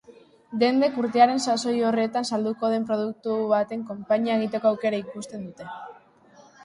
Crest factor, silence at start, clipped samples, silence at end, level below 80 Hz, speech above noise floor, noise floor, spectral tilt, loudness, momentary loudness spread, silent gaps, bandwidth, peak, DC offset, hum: 20 dB; 0.1 s; under 0.1%; 0.7 s; -70 dBFS; 30 dB; -54 dBFS; -5 dB/octave; -24 LUFS; 17 LU; none; 11.5 kHz; -6 dBFS; under 0.1%; none